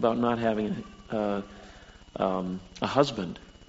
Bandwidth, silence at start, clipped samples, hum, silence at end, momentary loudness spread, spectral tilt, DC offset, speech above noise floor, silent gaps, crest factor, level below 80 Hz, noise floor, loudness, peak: 8 kHz; 0 s; under 0.1%; none; 0.05 s; 18 LU; -5 dB/octave; under 0.1%; 22 dB; none; 22 dB; -54 dBFS; -50 dBFS; -29 LUFS; -8 dBFS